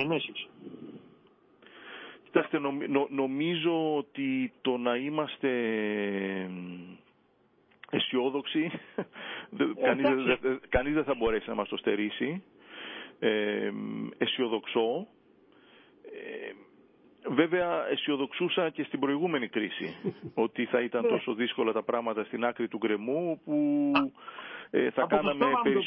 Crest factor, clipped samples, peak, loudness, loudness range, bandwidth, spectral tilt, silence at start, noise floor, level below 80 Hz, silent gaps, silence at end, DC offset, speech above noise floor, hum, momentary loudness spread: 22 dB; under 0.1%; -10 dBFS; -30 LUFS; 4 LU; 5.4 kHz; -9.5 dB/octave; 0 s; -67 dBFS; -60 dBFS; none; 0 s; under 0.1%; 37 dB; none; 15 LU